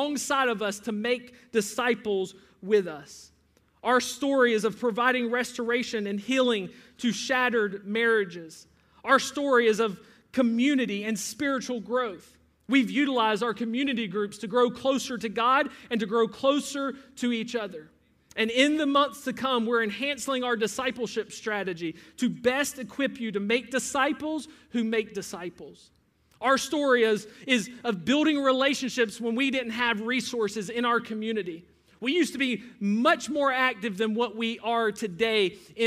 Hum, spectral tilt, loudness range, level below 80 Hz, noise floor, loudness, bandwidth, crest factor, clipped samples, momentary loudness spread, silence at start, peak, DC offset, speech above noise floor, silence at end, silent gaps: none; -3.5 dB/octave; 3 LU; -70 dBFS; -65 dBFS; -27 LUFS; 15.5 kHz; 20 dB; under 0.1%; 10 LU; 0 s; -8 dBFS; under 0.1%; 38 dB; 0 s; none